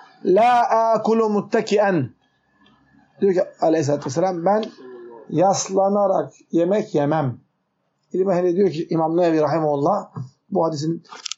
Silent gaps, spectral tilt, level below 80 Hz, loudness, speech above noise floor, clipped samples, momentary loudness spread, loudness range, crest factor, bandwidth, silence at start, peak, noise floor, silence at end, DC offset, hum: none; -6 dB/octave; -72 dBFS; -20 LUFS; 52 dB; under 0.1%; 11 LU; 2 LU; 14 dB; 8 kHz; 0.25 s; -6 dBFS; -71 dBFS; 0.1 s; under 0.1%; none